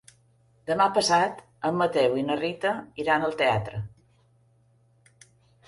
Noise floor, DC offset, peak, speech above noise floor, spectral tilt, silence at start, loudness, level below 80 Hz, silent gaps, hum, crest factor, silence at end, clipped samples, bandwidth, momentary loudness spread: -63 dBFS; under 0.1%; -8 dBFS; 38 dB; -4.5 dB/octave; 0.65 s; -25 LUFS; -58 dBFS; none; none; 20 dB; 1.8 s; under 0.1%; 11.5 kHz; 12 LU